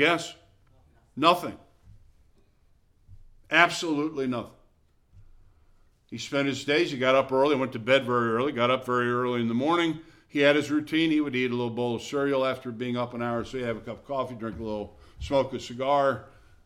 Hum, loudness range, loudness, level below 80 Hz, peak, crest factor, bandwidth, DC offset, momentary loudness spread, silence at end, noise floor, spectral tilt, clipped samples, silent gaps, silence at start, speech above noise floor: none; 6 LU; -26 LUFS; -56 dBFS; -4 dBFS; 24 dB; 16 kHz; under 0.1%; 13 LU; 0.4 s; -63 dBFS; -5 dB/octave; under 0.1%; none; 0 s; 37 dB